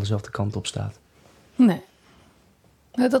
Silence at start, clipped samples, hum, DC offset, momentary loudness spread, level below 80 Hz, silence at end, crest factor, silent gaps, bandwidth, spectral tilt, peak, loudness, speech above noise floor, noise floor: 0 s; under 0.1%; none; under 0.1%; 14 LU; -58 dBFS; 0 s; 18 dB; none; 13 kHz; -6.5 dB/octave; -8 dBFS; -24 LUFS; 36 dB; -58 dBFS